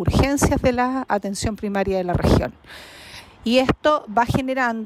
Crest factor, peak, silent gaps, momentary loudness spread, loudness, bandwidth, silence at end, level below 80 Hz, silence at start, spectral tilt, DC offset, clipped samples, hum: 14 dB; -6 dBFS; none; 20 LU; -21 LUFS; 15.5 kHz; 0 s; -34 dBFS; 0 s; -5.5 dB/octave; under 0.1%; under 0.1%; none